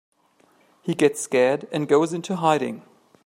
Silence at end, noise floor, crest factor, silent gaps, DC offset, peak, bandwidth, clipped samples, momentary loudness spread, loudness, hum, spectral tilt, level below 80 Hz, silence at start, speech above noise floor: 0.45 s; -61 dBFS; 18 dB; none; under 0.1%; -4 dBFS; 16 kHz; under 0.1%; 11 LU; -22 LUFS; none; -5 dB/octave; -72 dBFS; 0.85 s; 39 dB